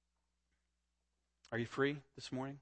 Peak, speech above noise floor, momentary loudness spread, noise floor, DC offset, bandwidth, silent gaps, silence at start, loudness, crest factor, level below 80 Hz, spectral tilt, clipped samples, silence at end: -22 dBFS; 45 dB; 9 LU; -86 dBFS; under 0.1%; 8.4 kHz; none; 1.5 s; -41 LUFS; 22 dB; -76 dBFS; -6 dB/octave; under 0.1%; 0.05 s